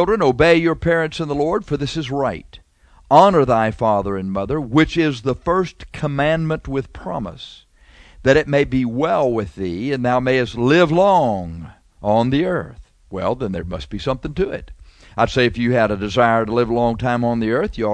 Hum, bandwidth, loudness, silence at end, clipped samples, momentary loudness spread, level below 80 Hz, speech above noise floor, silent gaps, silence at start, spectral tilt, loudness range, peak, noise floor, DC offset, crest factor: none; 10 kHz; -18 LUFS; 0 s; under 0.1%; 13 LU; -38 dBFS; 29 dB; none; 0 s; -7 dB/octave; 5 LU; 0 dBFS; -47 dBFS; under 0.1%; 18 dB